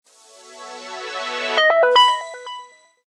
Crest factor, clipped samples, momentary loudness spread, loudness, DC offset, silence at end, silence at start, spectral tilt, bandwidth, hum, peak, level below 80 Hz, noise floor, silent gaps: 18 dB; under 0.1%; 23 LU; -16 LUFS; under 0.1%; 0.4 s; 0.5 s; 1 dB/octave; 12 kHz; none; -2 dBFS; -82 dBFS; -47 dBFS; none